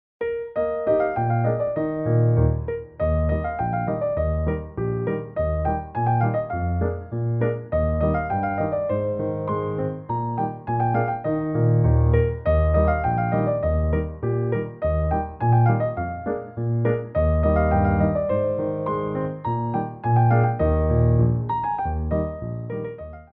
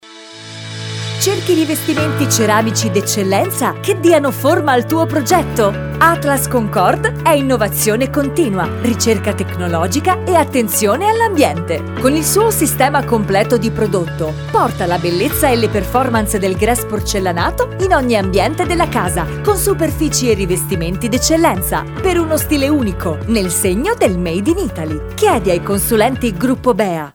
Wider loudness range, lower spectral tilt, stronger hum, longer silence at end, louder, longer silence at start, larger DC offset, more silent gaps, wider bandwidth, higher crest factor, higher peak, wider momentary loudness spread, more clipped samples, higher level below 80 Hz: about the same, 3 LU vs 2 LU; first, -10 dB/octave vs -4.5 dB/octave; neither; about the same, 0.1 s vs 0.05 s; second, -23 LUFS vs -14 LUFS; first, 0.2 s vs 0.05 s; neither; neither; second, 3.8 kHz vs over 20 kHz; about the same, 14 dB vs 14 dB; second, -8 dBFS vs 0 dBFS; first, 8 LU vs 5 LU; neither; about the same, -32 dBFS vs -32 dBFS